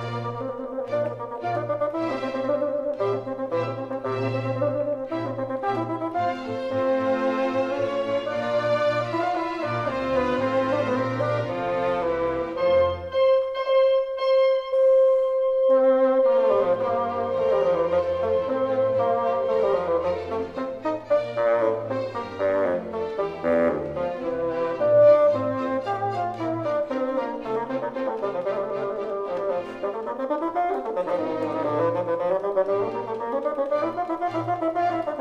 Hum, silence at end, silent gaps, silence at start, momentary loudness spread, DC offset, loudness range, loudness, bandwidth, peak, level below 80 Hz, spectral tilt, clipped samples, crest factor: none; 0 s; none; 0 s; 9 LU; under 0.1%; 7 LU; -24 LUFS; 7.4 kHz; -8 dBFS; -56 dBFS; -7.5 dB/octave; under 0.1%; 16 dB